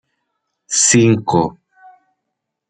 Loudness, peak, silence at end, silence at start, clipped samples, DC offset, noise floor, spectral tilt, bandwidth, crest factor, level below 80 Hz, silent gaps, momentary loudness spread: -14 LUFS; -2 dBFS; 1.2 s; 0.7 s; under 0.1%; under 0.1%; -77 dBFS; -4 dB/octave; 9.6 kHz; 16 dB; -52 dBFS; none; 9 LU